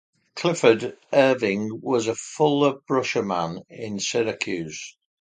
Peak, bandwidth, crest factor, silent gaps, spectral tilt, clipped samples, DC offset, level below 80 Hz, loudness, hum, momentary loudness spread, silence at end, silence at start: -2 dBFS; 9.4 kHz; 20 dB; none; -4.5 dB/octave; under 0.1%; under 0.1%; -64 dBFS; -23 LUFS; none; 14 LU; 0.3 s; 0.35 s